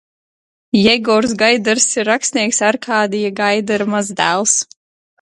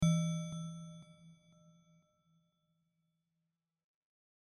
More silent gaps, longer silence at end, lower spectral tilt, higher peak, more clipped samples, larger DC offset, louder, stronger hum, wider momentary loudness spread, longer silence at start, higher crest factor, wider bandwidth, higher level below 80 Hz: neither; second, 0.6 s vs 3.2 s; second, -2.5 dB/octave vs -6 dB/octave; first, 0 dBFS vs -20 dBFS; neither; neither; first, -14 LUFS vs -39 LUFS; neither; second, 5 LU vs 25 LU; first, 0.75 s vs 0 s; second, 16 dB vs 22 dB; about the same, 11.5 kHz vs 11.5 kHz; first, -56 dBFS vs -66 dBFS